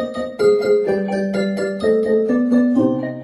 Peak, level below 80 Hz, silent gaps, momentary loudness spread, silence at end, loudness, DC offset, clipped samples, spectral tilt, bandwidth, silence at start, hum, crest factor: -4 dBFS; -54 dBFS; none; 5 LU; 0 s; -17 LUFS; under 0.1%; under 0.1%; -7 dB/octave; 11.5 kHz; 0 s; none; 12 dB